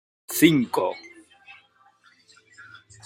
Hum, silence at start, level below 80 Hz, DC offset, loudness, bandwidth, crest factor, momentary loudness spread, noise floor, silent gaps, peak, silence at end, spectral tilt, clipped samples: none; 0.3 s; -66 dBFS; under 0.1%; -22 LUFS; 16 kHz; 24 dB; 13 LU; -59 dBFS; none; -2 dBFS; 0.45 s; -4.5 dB/octave; under 0.1%